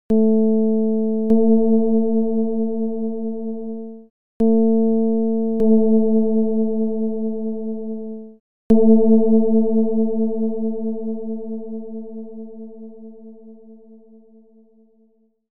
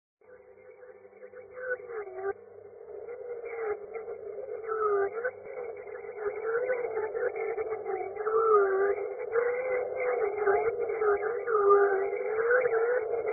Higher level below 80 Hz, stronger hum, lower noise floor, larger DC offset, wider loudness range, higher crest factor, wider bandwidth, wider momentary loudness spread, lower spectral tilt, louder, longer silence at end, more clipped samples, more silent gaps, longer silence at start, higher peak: first, -52 dBFS vs -70 dBFS; neither; first, -60 dBFS vs -54 dBFS; first, 4% vs under 0.1%; about the same, 14 LU vs 12 LU; about the same, 16 dB vs 18 dB; second, 1.2 kHz vs 2.6 kHz; about the same, 18 LU vs 17 LU; first, -13 dB/octave vs -8 dB/octave; first, -19 LUFS vs -30 LUFS; about the same, 0.1 s vs 0 s; neither; first, 4.10-4.40 s, 8.40-8.70 s vs none; second, 0.1 s vs 0.3 s; first, -4 dBFS vs -12 dBFS